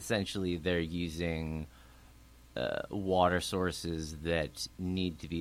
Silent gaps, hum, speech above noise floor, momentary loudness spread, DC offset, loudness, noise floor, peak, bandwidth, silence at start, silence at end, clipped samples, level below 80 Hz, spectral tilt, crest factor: none; none; 23 dB; 9 LU; under 0.1%; -34 LUFS; -57 dBFS; -14 dBFS; 16 kHz; 0 s; 0 s; under 0.1%; -50 dBFS; -5 dB/octave; 22 dB